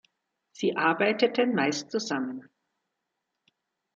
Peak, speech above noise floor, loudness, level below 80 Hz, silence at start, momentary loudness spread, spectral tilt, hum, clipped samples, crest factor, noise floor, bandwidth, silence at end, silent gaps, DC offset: -8 dBFS; 56 dB; -27 LUFS; -78 dBFS; 0.6 s; 8 LU; -4 dB/octave; none; under 0.1%; 22 dB; -83 dBFS; 7.8 kHz; 1.55 s; none; under 0.1%